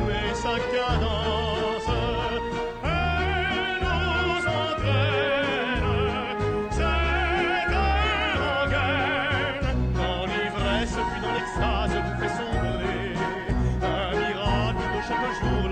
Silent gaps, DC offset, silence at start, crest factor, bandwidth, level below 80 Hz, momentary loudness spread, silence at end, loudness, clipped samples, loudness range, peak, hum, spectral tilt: none; under 0.1%; 0 s; 12 dB; 9.2 kHz; -32 dBFS; 4 LU; 0 s; -25 LUFS; under 0.1%; 3 LU; -14 dBFS; none; -5.5 dB/octave